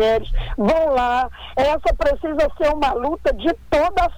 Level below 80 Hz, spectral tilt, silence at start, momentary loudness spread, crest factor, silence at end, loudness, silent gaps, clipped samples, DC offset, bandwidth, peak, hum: -30 dBFS; -6 dB/octave; 0 s; 5 LU; 12 dB; 0 s; -20 LUFS; none; under 0.1%; under 0.1%; 19 kHz; -6 dBFS; none